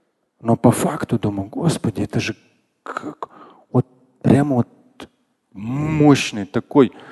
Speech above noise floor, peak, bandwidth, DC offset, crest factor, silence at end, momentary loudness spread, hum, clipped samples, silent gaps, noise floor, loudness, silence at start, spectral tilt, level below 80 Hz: 40 dB; 0 dBFS; 12.5 kHz; under 0.1%; 20 dB; 0 s; 17 LU; none; under 0.1%; none; -58 dBFS; -19 LUFS; 0.45 s; -6.5 dB/octave; -48 dBFS